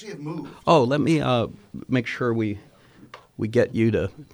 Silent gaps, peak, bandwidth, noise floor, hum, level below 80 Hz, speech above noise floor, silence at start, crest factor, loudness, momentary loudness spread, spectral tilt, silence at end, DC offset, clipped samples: none; -4 dBFS; over 20 kHz; -48 dBFS; none; -54 dBFS; 25 dB; 0 s; 20 dB; -23 LUFS; 15 LU; -7 dB/octave; 0.1 s; under 0.1%; under 0.1%